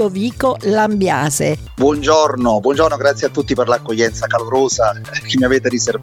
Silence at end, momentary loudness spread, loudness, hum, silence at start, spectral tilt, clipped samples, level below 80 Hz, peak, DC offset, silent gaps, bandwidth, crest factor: 0 s; 5 LU; -15 LUFS; none; 0 s; -4.5 dB/octave; under 0.1%; -38 dBFS; 0 dBFS; under 0.1%; none; 16.5 kHz; 16 dB